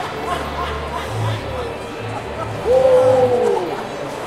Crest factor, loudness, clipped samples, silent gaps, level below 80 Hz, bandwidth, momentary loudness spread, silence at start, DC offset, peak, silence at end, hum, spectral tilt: 16 dB; -19 LUFS; under 0.1%; none; -38 dBFS; 13.5 kHz; 14 LU; 0 s; under 0.1%; -2 dBFS; 0 s; none; -6 dB/octave